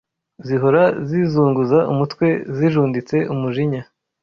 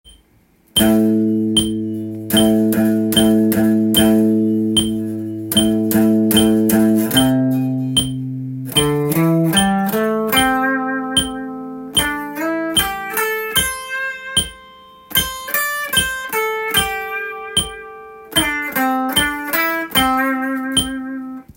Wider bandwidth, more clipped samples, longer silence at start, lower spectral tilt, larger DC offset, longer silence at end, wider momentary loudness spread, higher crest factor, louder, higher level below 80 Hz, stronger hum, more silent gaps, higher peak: second, 6.8 kHz vs 17 kHz; neither; first, 0.4 s vs 0.05 s; first, -9 dB/octave vs -3.5 dB/octave; neither; first, 0.4 s vs 0.15 s; second, 7 LU vs 10 LU; about the same, 16 dB vs 16 dB; about the same, -18 LUFS vs -16 LUFS; second, -56 dBFS vs -42 dBFS; neither; neither; about the same, -2 dBFS vs 0 dBFS